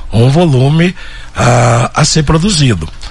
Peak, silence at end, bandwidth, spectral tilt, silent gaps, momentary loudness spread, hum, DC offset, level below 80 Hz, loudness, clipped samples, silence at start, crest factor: 0 dBFS; 0 s; 11.5 kHz; -5.5 dB/octave; none; 7 LU; none; under 0.1%; -26 dBFS; -10 LUFS; under 0.1%; 0 s; 10 dB